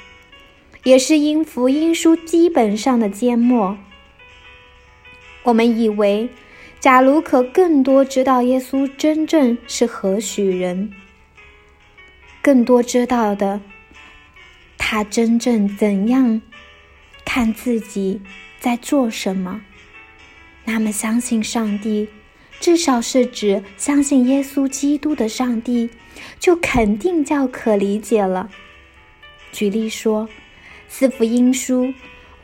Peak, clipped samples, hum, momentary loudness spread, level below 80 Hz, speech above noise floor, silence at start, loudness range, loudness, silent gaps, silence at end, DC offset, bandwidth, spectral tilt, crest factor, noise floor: 0 dBFS; under 0.1%; none; 10 LU; -48 dBFS; 32 dB; 0.85 s; 6 LU; -17 LUFS; none; 0.35 s; under 0.1%; 16.5 kHz; -4.5 dB/octave; 18 dB; -48 dBFS